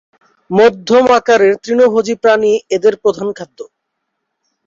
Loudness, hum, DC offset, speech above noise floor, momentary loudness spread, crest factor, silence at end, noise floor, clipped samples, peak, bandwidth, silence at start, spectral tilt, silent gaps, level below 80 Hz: -12 LUFS; none; under 0.1%; 61 dB; 11 LU; 12 dB; 1.05 s; -72 dBFS; under 0.1%; 0 dBFS; 7.6 kHz; 0.5 s; -5 dB/octave; none; -56 dBFS